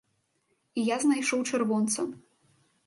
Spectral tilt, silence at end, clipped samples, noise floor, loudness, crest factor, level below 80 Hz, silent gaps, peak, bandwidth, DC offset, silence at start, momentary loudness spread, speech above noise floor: -3.5 dB/octave; 0.7 s; under 0.1%; -74 dBFS; -28 LUFS; 16 dB; -78 dBFS; none; -14 dBFS; 11.5 kHz; under 0.1%; 0.75 s; 8 LU; 47 dB